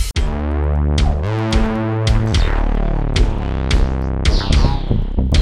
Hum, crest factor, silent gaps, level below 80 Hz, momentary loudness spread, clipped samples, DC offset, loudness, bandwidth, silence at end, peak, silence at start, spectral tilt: none; 14 dB; none; -18 dBFS; 4 LU; under 0.1%; under 0.1%; -18 LUFS; 12 kHz; 0 s; -2 dBFS; 0 s; -6 dB/octave